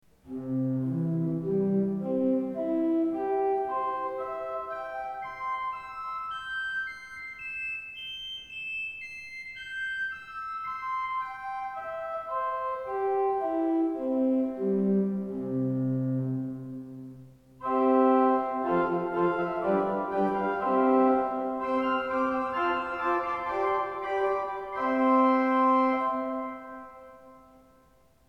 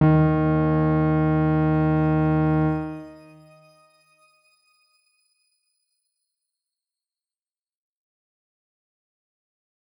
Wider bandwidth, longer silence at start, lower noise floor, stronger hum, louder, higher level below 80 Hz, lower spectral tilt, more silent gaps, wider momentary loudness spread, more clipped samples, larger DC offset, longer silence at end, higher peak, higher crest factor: first, 8.2 kHz vs 4.9 kHz; first, 0.25 s vs 0 s; second, -62 dBFS vs under -90 dBFS; neither; second, -29 LUFS vs -21 LUFS; second, -64 dBFS vs -46 dBFS; second, -8 dB/octave vs -11 dB/octave; neither; first, 13 LU vs 10 LU; neither; neither; second, 0.9 s vs 6.85 s; second, -12 dBFS vs -6 dBFS; about the same, 18 dB vs 18 dB